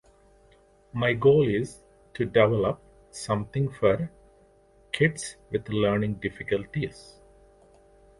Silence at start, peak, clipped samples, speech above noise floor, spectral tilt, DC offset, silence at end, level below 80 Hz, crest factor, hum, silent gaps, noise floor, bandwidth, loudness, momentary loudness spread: 0.95 s; -6 dBFS; under 0.1%; 34 dB; -6 dB/octave; under 0.1%; 1.2 s; -54 dBFS; 22 dB; none; none; -59 dBFS; 11.5 kHz; -26 LUFS; 16 LU